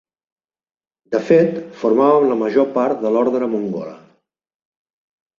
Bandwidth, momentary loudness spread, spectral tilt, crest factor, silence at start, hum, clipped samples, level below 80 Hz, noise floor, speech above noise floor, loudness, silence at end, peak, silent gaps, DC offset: 7.2 kHz; 10 LU; -8 dB/octave; 18 dB; 1.1 s; none; under 0.1%; -64 dBFS; under -90 dBFS; over 74 dB; -17 LUFS; 1.4 s; -2 dBFS; none; under 0.1%